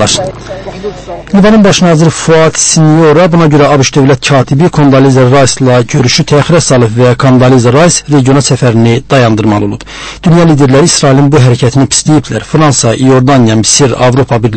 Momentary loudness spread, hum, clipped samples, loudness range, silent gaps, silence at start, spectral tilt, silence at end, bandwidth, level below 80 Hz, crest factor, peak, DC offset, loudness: 7 LU; none; 4%; 2 LU; none; 0 s; -5 dB/octave; 0 s; 11 kHz; -32 dBFS; 6 dB; 0 dBFS; under 0.1%; -6 LUFS